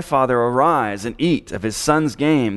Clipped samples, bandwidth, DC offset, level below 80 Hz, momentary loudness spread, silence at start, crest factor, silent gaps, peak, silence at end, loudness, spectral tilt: under 0.1%; 12 kHz; under 0.1%; -46 dBFS; 6 LU; 0 s; 16 dB; none; -2 dBFS; 0 s; -18 LUFS; -5.5 dB/octave